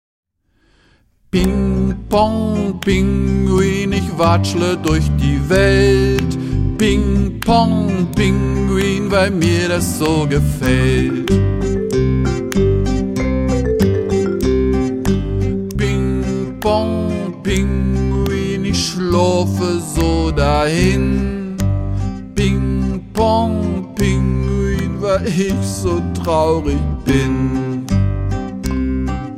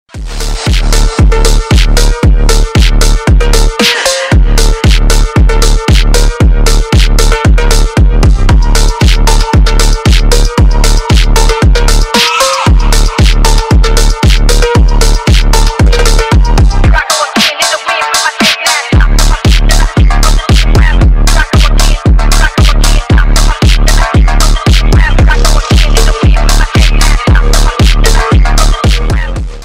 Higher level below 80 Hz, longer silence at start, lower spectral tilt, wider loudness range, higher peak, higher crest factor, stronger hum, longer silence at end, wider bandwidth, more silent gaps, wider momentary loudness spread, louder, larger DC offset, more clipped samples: second, -24 dBFS vs -6 dBFS; first, 1.35 s vs 0.15 s; first, -6.5 dB/octave vs -4 dB/octave; about the same, 3 LU vs 1 LU; about the same, -2 dBFS vs 0 dBFS; first, 14 dB vs 6 dB; neither; about the same, 0 s vs 0 s; about the same, 16 kHz vs 16 kHz; neither; first, 5 LU vs 2 LU; second, -16 LUFS vs -8 LUFS; second, under 0.1% vs 1%; neither